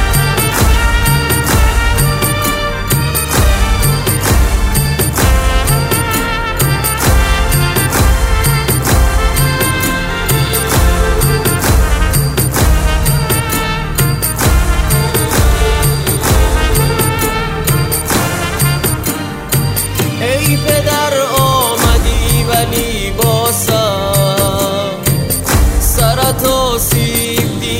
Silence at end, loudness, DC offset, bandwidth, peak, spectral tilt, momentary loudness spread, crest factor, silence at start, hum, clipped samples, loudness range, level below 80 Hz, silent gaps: 0 s; -12 LUFS; under 0.1%; 16.5 kHz; 0 dBFS; -4 dB/octave; 3 LU; 12 dB; 0 s; none; under 0.1%; 1 LU; -16 dBFS; none